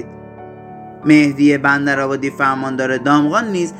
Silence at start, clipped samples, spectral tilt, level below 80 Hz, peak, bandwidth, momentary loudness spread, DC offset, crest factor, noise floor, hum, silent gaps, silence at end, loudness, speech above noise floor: 0 s; under 0.1%; -6 dB/octave; -54 dBFS; 0 dBFS; 9.2 kHz; 23 LU; under 0.1%; 16 dB; -35 dBFS; none; none; 0 s; -15 LUFS; 20 dB